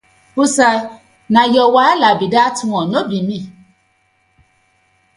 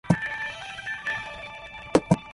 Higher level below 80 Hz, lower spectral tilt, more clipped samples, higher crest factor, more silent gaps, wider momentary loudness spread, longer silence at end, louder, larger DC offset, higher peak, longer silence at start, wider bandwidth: second, -58 dBFS vs -50 dBFS; second, -4 dB/octave vs -6 dB/octave; neither; second, 16 dB vs 24 dB; neither; about the same, 14 LU vs 15 LU; first, 1.65 s vs 0 s; first, -14 LUFS vs -28 LUFS; neither; first, 0 dBFS vs -4 dBFS; first, 0.35 s vs 0.05 s; about the same, 11.5 kHz vs 11.5 kHz